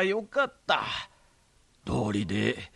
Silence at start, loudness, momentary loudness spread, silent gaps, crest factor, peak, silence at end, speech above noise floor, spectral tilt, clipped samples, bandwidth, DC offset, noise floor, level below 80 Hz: 0 s; -29 LUFS; 9 LU; none; 20 dB; -10 dBFS; 0.1 s; 35 dB; -5.5 dB/octave; under 0.1%; 11.5 kHz; under 0.1%; -64 dBFS; -54 dBFS